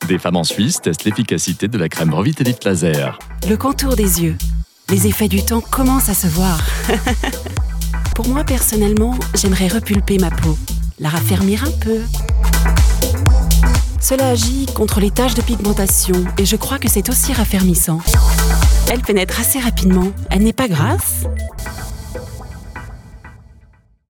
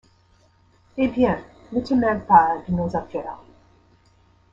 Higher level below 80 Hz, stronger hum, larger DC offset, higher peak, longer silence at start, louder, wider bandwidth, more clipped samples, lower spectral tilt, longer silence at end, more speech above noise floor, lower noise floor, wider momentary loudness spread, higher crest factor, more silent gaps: first, -20 dBFS vs -50 dBFS; neither; neither; about the same, 0 dBFS vs -2 dBFS; second, 0 s vs 0.95 s; first, -16 LUFS vs -21 LUFS; first, 19 kHz vs 7.4 kHz; neither; second, -4.5 dB/octave vs -8.5 dB/octave; second, 0.75 s vs 1.15 s; second, 34 dB vs 38 dB; second, -49 dBFS vs -58 dBFS; second, 9 LU vs 17 LU; second, 14 dB vs 22 dB; neither